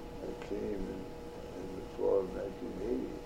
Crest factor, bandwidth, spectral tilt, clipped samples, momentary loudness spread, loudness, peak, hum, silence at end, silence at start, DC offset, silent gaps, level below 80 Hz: 18 dB; 16 kHz; -7 dB/octave; under 0.1%; 12 LU; -38 LUFS; -20 dBFS; none; 0 s; 0 s; under 0.1%; none; -52 dBFS